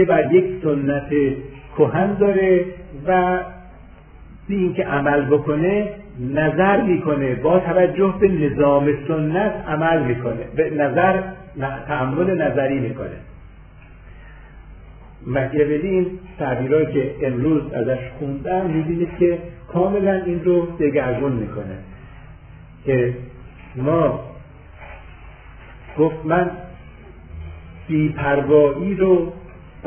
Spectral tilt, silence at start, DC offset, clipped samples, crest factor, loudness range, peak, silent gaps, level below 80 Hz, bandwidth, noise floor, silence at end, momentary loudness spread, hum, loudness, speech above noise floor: -12 dB/octave; 0 s; under 0.1%; under 0.1%; 18 dB; 7 LU; -2 dBFS; none; -42 dBFS; 3.5 kHz; -42 dBFS; 0 s; 16 LU; none; -19 LUFS; 24 dB